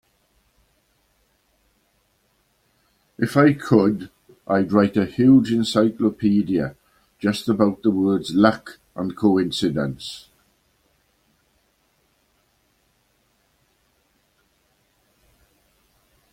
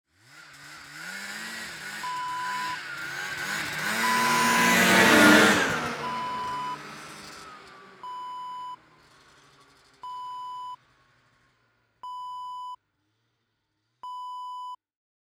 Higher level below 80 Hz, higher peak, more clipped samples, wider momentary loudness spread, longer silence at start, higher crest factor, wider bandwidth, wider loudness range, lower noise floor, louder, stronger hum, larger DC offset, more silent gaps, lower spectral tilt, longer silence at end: first, -58 dBFS vs -64 dBFS; about the same, -2 dBFS vs -4 dBFS; neither; second, 15 LU vs 26 LU; first, 3.2 s vs 0.35 s; about the same, 20 dB vs 24 dB; second, 15 kHz vs over 20 kHz; second, 8 LU vs 22 LU; second, -66 dBFS vs -77 dBFS; first, -20 LUFS vs -23 LUFS; neither; neither; neither; first, -6.5 dB/octave vs -3 dB/octave; first, 6.15 s vs 0.5 s